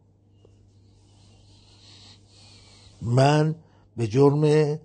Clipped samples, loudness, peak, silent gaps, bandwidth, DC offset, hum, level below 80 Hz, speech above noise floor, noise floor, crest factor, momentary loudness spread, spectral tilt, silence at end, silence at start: under 0.1%; -21 LUFS; -6 dBFS; none; 9.4 kHz; under 0.1%; none; -60 dBFS; 37 dB; -57 dBFS; 20 dB; 18 LU; -7.5 dB/octave; 0.05 s; 3 s